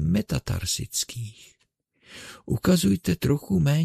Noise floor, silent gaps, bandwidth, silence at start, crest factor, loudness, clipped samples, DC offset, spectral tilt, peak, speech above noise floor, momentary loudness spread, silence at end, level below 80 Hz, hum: -70 dBFS; none; 14 kHz; 0 s; 18 dB; -25 LUFS; under 0.1%; under 0.1%; -5.5 dB/octave; -8 dBFS; 45 dB; 20 LU; 0 s; -44 dBFS; none